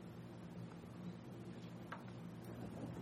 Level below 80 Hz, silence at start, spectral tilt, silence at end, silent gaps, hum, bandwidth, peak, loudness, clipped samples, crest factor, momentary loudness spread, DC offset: -72 dBFS; 0 s; -7 dB/octave; 0 s; none; none; 15.5 kHz; -34 dBFS; -52 LUFS; under 0.1%; 16 dB; 3 LU; under 0.1%